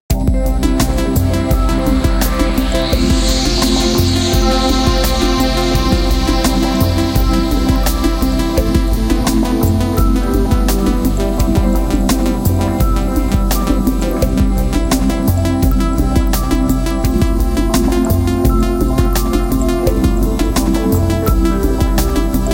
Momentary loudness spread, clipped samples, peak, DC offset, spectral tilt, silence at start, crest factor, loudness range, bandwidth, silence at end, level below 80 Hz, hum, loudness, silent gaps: 2 LU; under 0.1%; 0 dBFS; under 0.1%; -5.5 dB/octave; 0.1 s; 12 dB; 2 LU; 17 kHz; 0 s; -16 dBFS; none; -15 LUFS; none